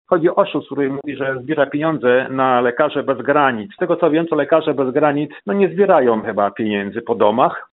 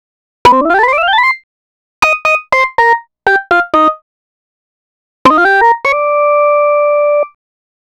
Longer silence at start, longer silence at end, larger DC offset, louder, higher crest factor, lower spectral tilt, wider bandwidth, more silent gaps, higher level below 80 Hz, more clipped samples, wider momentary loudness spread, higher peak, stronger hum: second, 0.1 s vs 0.45 s; second, 0.1 s vs 0.7 s; neither; second, -17 LUFS vs -10 LUFS; about the same, 16 dB vs 12 dB; about the same, -4.5 dB/octave vs -3.5 dB/octave; second, 4.1 kHz vs 14.5 kHz; second, none vs 1.43-2.02 s, 4.02-5.25 s; second, -64 dBFS vs -46 dBFS; neither; about the same, 7 LU vs 5 LU; about the same, 0 dBFS vs 0 dBFS; neither